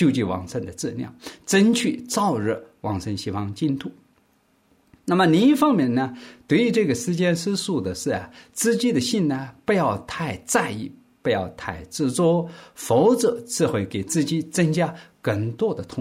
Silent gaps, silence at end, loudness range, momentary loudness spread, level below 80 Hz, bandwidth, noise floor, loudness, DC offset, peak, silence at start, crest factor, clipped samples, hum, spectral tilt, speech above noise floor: none; 0 s; 4 LU; 12 LU; -60 dBFS; 16 kHz; -63 dBFS; -23 LUFS; under 0.1%; -6 dBFS; 0 s; 16 dB; under 0.1%; none; -5 dB/octave; 41 dB